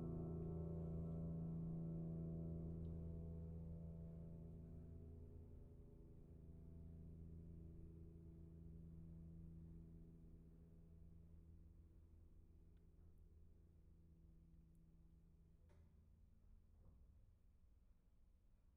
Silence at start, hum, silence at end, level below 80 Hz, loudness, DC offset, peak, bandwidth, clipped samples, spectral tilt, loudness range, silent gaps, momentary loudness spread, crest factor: 0 s; none; 0 s; -64 dBFS; -55 LUFS; under 0.1%; -40 dBFS; 1.8 kHz; under 0.1%; -13 dB/octave; 17 LU; none; 17 LU; 16 dB